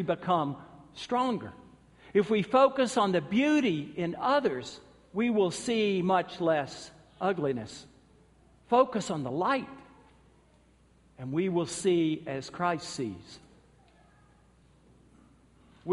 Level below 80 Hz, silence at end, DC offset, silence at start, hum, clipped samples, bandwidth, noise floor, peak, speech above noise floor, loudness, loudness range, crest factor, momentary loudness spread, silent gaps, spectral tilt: -66 dBFS; 0 s; under 0.1%; 0 s; none; under 0.1%; 11.5 kHz; -62 dBFS; -10 dBFS; 34 dB; -29 LUFS; 6 LU; 22 dB; 19 LU; none; -5.5 dB/octave